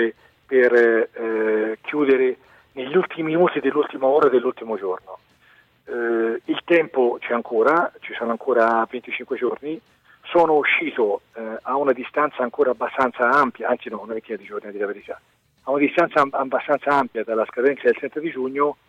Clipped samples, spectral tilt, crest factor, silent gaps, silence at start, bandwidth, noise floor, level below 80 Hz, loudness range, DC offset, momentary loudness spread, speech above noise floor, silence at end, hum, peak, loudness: under 0.1%; -6.5 dB/octave; 16 dB; none; 0 s; 7.8 kHz; -56 dBFS; -68 dBFS; 3 LU; under 0.1%; 13 LU; 35 dB; 0.15 s; none; -6 dBFS; -21 LUFS